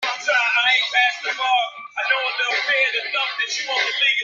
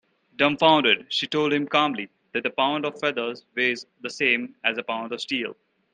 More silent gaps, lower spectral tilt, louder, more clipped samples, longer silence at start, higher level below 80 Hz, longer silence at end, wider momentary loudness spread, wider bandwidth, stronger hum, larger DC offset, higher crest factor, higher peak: neither; second, 2.5 dB/octave vs -4 dB/octave; first, -19 LUFS vs -23 LUFS; neither; second, 0 s vs 0.4 s; second, -80 dBFS vs -72 dBFS; second, 0 s vs 0.4 s; second, 6 LU vs 11 LU; second, 7.8 kHz vs 9.6 kHz; neither; neither; second, 16 dB vs 22 dB; about the same, -4 dBFS vs -4 dBFS